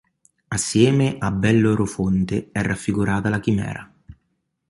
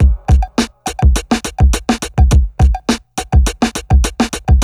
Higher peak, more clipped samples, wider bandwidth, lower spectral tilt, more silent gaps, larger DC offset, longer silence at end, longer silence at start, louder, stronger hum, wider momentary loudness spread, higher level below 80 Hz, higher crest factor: about the same, -2 dBFS vs 0 dBFS; neither; second, 11.5 kHz vs 14 kHz; about the same, -6 dB/octave vs -5.5 dB/octave; neither; neither; first, 0.55 s vs 0 s; first, 0.5 s vs 0 s; second, -21 LUFS vs -15 LUFS; neither; about the same, 8 LU vs 6 LU; second, -44 dBFS vs -14 dBFS; first, 18 dB vs 12 dB